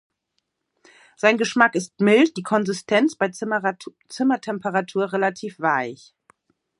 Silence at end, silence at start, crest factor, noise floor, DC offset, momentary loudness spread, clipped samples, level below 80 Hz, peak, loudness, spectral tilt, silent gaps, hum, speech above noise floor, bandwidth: 0.85 s; 1.25 s; 22 dB; -76 dBFS; under 0.1%; 8 LU; under 0.1%; -74 dBFS; -2 dBFS; -21 LUFS; -5 dB/octave; none; none; 54 dB; 11.5 kHz